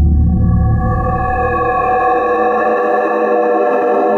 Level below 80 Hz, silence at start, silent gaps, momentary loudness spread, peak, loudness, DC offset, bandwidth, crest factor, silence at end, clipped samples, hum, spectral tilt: -20 dBFS; 0 s; none; 2 LU; -4 dBFS; -14 LUFS; under 0.1%; 4.2 kHz; 10 dB; 0 s; under 0.1%; none; -10 dB/octave